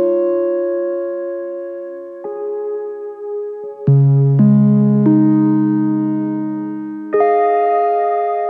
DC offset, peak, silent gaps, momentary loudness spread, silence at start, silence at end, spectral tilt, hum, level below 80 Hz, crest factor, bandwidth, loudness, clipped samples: under 0.1%; -2 dBFS; none; 15 LU; 0 s; 0 s; -13 dB/octave; none; -62 dBFS; 14 dB; 3 kHz; -16 LUFS; under 0.1%